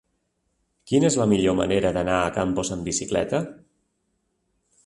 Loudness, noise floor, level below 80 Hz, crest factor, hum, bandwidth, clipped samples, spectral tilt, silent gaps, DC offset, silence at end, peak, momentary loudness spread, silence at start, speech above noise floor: -23 LUFS; -73 dBFS; -48 dBFS; 18 dB; none; 11.5 kHz; under 0.1%; -5 dB/octave; none; under 0.1%; 1.3 s; -6 dBFS; 7 LU; 0.85 s; 51 dB